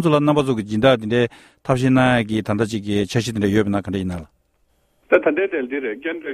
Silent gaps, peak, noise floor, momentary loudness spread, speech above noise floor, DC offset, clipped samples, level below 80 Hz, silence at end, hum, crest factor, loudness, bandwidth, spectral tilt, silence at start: none; 0 dBFS; -63 dBFS; 9 LU; 44 dB; under 0.1%; under 0.1%; -48 dBFS; 0 s; none; 18 dB; -19 LUFS; 14 kHz; -6.5 dB/octave; 0 s